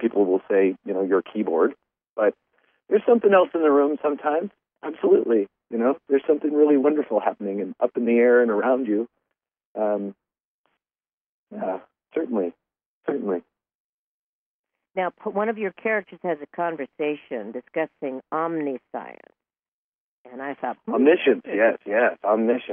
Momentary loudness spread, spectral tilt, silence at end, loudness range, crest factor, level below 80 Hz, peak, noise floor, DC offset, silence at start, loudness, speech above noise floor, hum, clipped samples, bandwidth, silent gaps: 15 LU; -4.5 dB/octave; 0 s; 10 LU; 20 dB; -82 dBFS; -4 dBFS; under -90 dBFS; under 0.1%; 0 s; -23 LUFS; over 68 dB; none; under 0.1%; 3.6 kHz; 2.09-2.16 s, 9.65-9.75 s, 10.40-10.64 s, 11.13-11.47 s, 12.86-13.01 s, 13.75-14.64 s, 19.68-20.25 s